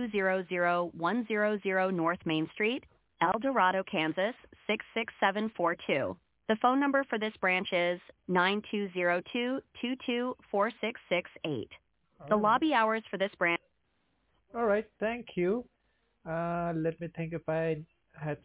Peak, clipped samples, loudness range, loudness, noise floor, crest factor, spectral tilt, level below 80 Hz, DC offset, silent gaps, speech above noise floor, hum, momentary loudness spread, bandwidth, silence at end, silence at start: -12 dBFS; under 0.1%; 4 LU; -31 LUFS; -76 dBFS; 20 dB; -3.5 dB/octave; -68 dBFS; under 0.1%; none; 45 dB; none; 10 LU; 4 kHz; 0.05 s; 0 s